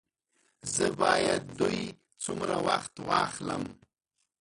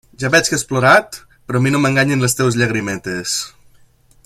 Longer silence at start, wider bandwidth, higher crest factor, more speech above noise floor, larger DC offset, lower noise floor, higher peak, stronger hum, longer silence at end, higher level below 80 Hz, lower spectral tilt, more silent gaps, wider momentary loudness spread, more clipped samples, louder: first, 0.65 s vs 0.2 s; second, 11.5 kHz vs 16 kHz; first, 22 dB vs 16 dB; first, 51 dB vs 34 dB; neither; first, -81 dBFS vs -50 dBFS; second, -10 dBFS vs 0 dBFS; neither; second, 0.65 s vs 0.8 s; second, -60 dBFS vs -50 dBFS; about the same, -3.5 dB/octave vs -4 dB/octave; neither; about the same, 12 LU vs 11 LU; neither; second, -30 LUFS vs -15 LUFS